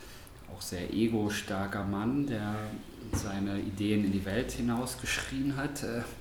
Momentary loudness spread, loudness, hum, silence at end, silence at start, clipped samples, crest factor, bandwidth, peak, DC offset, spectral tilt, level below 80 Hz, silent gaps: 10 LU; -33 LUFS; none; 0 s; 0 s; under 0.1%; 18 dB; 19 kHz; -16 dBFS; under 0.1%; -5 dB/octave; -50 dBFS; none